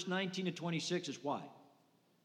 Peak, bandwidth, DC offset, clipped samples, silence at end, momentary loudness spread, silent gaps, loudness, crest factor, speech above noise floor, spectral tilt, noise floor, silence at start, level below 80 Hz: -24 dBFS; 11.5 kHz; under 0.1%; under 0.1%; 0.6 s; 6 LU; none; -40 LUFS; 18 dB; 33 dB; -4.5 dB/octave; -72 dBFS; 0 s; under -90 dBFS